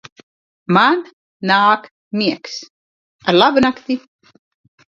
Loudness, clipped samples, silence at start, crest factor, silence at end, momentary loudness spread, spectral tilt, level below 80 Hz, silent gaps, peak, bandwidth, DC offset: -16 LUFS; under 0.1%; 0.7 s; 18 dB; 0.95 s; 14 LU; -5.5 dB/octave; -60 dBFS; 1.13-1.40 s, 1.91-2.11 s, 2.70-3.19 s; 0 dBFS; 7.6 kHz; under 0.1%